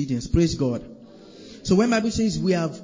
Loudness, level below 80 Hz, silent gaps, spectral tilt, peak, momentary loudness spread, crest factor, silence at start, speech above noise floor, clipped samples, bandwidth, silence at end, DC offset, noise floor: -22 LUFS; -38 dBFS; none; -6 dB/octave; -6 dBFS; 13 LU; 16 dB; 0 s; 23 dB; under 0.1%; 7.6 kHz; 0 s; under 0.1%; -45 dBFS